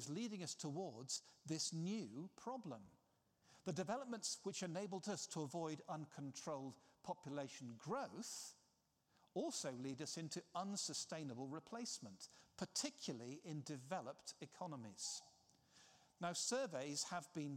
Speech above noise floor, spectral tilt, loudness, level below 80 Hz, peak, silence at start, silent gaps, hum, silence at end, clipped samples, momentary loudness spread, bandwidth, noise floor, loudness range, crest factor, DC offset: 33 dB; -3.5 dB/octave; -48 LUFS; under -90 dBFS; -28 dBFS; 0 s; none; none; 0 s; under 0.1%; 9 LU; 16 kHz; -82 dBFS; 3 LU; 20 dB; under 0.1%